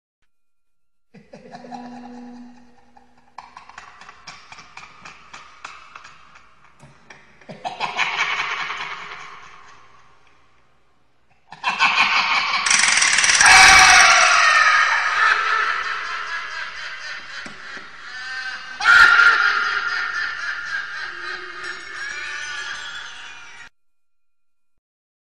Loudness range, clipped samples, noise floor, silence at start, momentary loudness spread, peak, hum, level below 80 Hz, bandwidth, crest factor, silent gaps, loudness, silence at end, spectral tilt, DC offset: 20 LU; under 0.1%; -78 dBFS; 1.15 s; 25 LU; 0 dBFS; none; -50 dBFS; 15 kHz; 20 dB; none; -15 LUFS; 1.7 s; 1 dB/octave; 0.4%